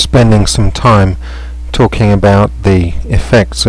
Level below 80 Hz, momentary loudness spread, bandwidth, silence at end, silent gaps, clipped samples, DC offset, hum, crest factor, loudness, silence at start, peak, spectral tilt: -18 dBFS; 12 LU; 11 kHz; 0 s; none; under 0.1%; under 0.1%; none; 8 dB; -10 LUFS; 0 s; 0 dBFS; -6 dB/octave